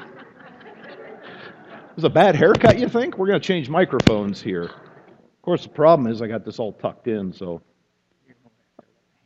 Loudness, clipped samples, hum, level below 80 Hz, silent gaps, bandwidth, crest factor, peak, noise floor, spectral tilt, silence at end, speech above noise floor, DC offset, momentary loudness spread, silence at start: -19 LUFS; under 0.1%; none; -48 dBFS; none; 8.8 kHz; 22 dB; 0 dBFS; -68 dBFS; -7 dB/octave; 1.7 s; 49 dB; under 0.1%; 25 LU; 0 s